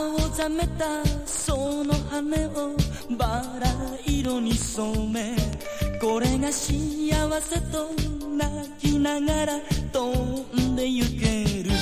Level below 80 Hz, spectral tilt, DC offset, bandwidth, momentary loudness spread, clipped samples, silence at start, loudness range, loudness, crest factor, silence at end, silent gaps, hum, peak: -32 dBFS; -5 dB/octave; under 0.1%; 16 kHz; 4 LU; under 0.1%; 0 s; 1 LU; -26 LUFS; 18 dB; 0 s; none; none; -8 dBFS